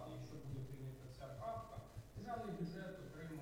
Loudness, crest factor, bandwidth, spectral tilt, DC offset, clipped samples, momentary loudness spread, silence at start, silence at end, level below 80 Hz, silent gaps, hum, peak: -50 LUFS; 14 dB; 16 kHz; -7 dB/octave; under 0.1%; under 0.1%; 7 LU; 0 s; 0 s; -64 dBFS; none; none; -36 dBFS